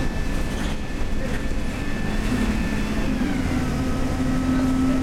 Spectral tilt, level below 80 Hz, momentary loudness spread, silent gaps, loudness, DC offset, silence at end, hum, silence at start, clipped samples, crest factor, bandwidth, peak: -6 dB/octave; -28 dBFS; 7 LU; none; -25 LUFS; under 0.1%; 0 s; none; 0 s; under 0.1%; 12 dB; 15 kHz; -10 dBFS